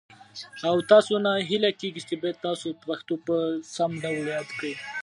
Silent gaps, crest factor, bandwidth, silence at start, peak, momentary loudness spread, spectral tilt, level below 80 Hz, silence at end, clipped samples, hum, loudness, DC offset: none; 22 dB; 11.5 kHz; 0.35 s; -4 dBFS; 14 LU; -5 dB/octave; -74 dBFS; 0 s; under 0.1%; none; -26 LUFS; under 0.1%